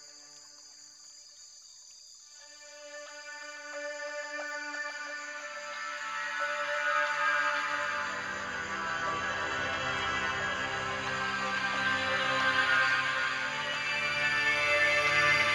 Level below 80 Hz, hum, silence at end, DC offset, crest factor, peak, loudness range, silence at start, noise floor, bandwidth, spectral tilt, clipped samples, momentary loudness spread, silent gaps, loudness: -64 dBFS; none; 0 s; under 0.1%; 18 dB; -14 dBFS; 15 LU; 0 s; -53 dBFS; 15 kHz; -2 dB/octave; under 0.1%; 24 LU; none; -30 LUFS